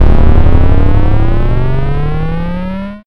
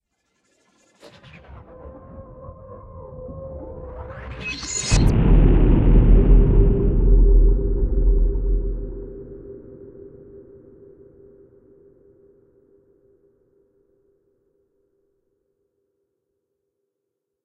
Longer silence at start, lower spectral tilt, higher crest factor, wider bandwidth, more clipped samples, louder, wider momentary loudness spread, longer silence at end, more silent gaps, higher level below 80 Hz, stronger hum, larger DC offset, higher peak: second, 0 s vs 1.85 s; first, -9.5 dB/octave vs -6.5 dB/octave; second, 6 dB vs 18 dB; second, 4.4 kHz vs 9.4 kHz; neither; first, -13 LUFS vs -19 LUFS; second, 8 LU vs 25 LU; second, 0.1 s vs 7.9 s; neither; first, -10 dBFS vs -22 dBFS; neither; neither; about the same, 0 dBFS vs -2 dBFS